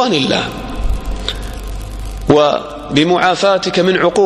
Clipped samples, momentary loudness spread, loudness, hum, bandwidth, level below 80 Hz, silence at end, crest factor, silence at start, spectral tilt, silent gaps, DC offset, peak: under 0.1%; 15 LU; -14 LUFS; none; 14.5 kHz; -26 dBFS; 0 s; 14 dB; 0 s; -5 dB/octave; none; under 0.1%; 0 dBFS